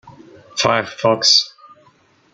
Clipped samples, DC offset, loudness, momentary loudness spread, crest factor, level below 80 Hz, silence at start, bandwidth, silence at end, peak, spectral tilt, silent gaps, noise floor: under 0.1%; under 0.1%; -15 LUFS; 15 LU; 18 dB; -60 dBFS; 0.05 s; 12 kHz; 0.85 s; -2 dBFS; -2 dB/octave; none; -54 dBFS